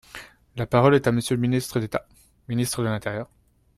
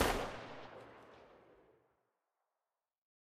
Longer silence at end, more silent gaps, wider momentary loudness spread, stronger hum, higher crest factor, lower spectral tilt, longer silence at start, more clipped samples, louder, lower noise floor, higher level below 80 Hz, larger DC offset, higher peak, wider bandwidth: second, 0.55 s vs 1.85 s; neither; about the same, 21 LU vs 23 LU; neither; second, 20 dB vs 28 dB; first, -6 dB/octave vs -3.5 dB/octave; first, 0.15 s vs 0 s; neither; first, -24 LUFS vs -43 LUFS; second, -44 dBFS vs under -90 dBFS; about the same, -52 dBFS vs -56 dBFS; neither; first, -4 dBFS vs -18 dBFS; about the same, 14 kHz vs 15 kHz